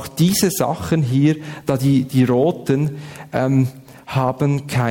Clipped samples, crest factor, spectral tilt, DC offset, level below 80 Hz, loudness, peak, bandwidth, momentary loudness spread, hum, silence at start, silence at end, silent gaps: under 0.1%; 14 dB; -6 dB/octave; under 0.1%; -50 dBFS; -18 LUFS; -4 dBFS; 17.5 kHz; 8 LU; none; 0 s; 0 s; none